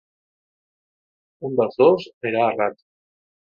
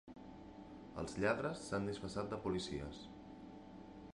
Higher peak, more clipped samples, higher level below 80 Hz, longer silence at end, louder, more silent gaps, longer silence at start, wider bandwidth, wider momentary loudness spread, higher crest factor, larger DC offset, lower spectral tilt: first, -4 dBFS vs -22 dBFS; neither; second, -68 dBFS vs -62 dBFS; first, 0.85 s vs 0 s; first, -20 LUFS vs -42 LUFS; first, 2.14-2.21 s vs none; first, 1.4 s vs 0.05 s; second, 6.8 kHz vs 11.5 kHz; second, 9 LU vs 18 LU; about the same, 20 dB vs 22 dB; neither; first, -8 dB/octave vs -5.5 dB/octave